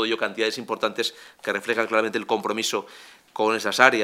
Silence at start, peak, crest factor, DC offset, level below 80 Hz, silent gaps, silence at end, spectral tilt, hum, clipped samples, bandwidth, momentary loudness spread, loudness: 0 s; 0 dBFS; 24 dB; under 0.1%; -78 dBFS; none; 0 s; -2.5 dB/octave; none; under 0.1%; 16 kHz; 9 LU; -24 LUFS